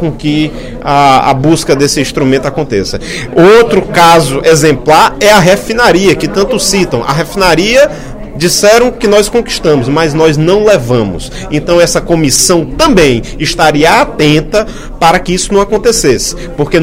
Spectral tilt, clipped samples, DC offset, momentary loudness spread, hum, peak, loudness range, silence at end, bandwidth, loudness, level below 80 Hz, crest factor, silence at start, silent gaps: -4 dB/octave; 2%; under 0.1%; 8 LU; none; 0 dBFS; 3 LU; 0 s; 17.5 kHz; -8 LUFS; -26 dBFS; 8 dB; 0 s; none